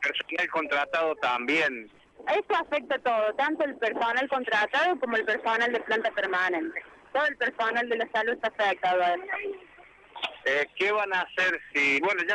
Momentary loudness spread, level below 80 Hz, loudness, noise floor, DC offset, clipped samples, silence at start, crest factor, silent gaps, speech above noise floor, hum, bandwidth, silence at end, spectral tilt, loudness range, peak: 6 LU; -70 dBFS; -27 LUFS; -53 dBFS; under 0.1%; under 0.1%; 0 s; 12 dB; none; 26 dB; none; 11.5 kHz; 0 s; -3 dB/octave; 2 LU; -16 dBFS